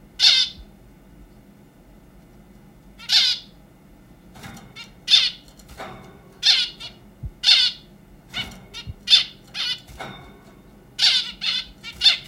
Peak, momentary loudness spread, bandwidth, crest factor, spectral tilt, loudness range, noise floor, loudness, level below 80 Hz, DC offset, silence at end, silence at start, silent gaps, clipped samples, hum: 0 dBFS; 25 LU; 16.5 kHz; 24 dB; 0 dB/octave; 6 LU; -49 dBFS; -18 LUFS; -50 dBFS; under 0.1%; 0.05 s; 0.2 s; none; under 0.1%; none